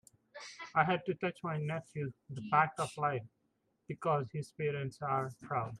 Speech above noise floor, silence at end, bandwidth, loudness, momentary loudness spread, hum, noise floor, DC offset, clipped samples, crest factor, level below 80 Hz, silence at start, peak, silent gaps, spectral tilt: 44 dB; 0 s; 12.5 kHz; -36 LUFS; 15 LU; none; -79 dBFS; under 0.1%; under 0.1%; 22 dB; -74 dBFS; 0.35 s; -16 dBFS; none; -6 dB/octave